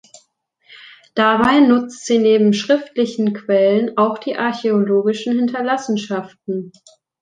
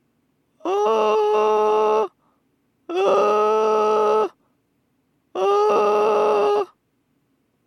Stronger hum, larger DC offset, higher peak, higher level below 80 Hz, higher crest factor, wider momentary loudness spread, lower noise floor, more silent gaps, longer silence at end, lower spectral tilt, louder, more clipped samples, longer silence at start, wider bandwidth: neither; neither; first, -2 dBFS vs -6 dBFS; first, -58 dBFS vs -86 dBFS; about the same, 16 dB vs 14 dB; first, 13 LU vs 10 LU; second, -61 dBFS vs -68 dBFS; neither; second, 0.5 s vs 1 s; about the same, -5.5 dB/octave vs -4.5 dB/octave; about the same, -17 LUFS vs -19 LUFS; neither; about the same, 0.7 s vs 0.65 s; about the same, 9.4 kHz vs 9.6 kHz